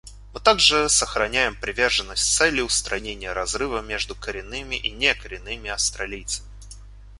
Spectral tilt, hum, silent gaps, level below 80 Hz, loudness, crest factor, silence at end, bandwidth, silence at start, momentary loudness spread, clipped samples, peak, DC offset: -1 dB/octave; none; none; -40 dBFS; -22 LUFS; 22 dB; 0 s; 11.5 kHz; 0.05 s; 14 LU; under 0.1%; -2 dBFS; under 0.1%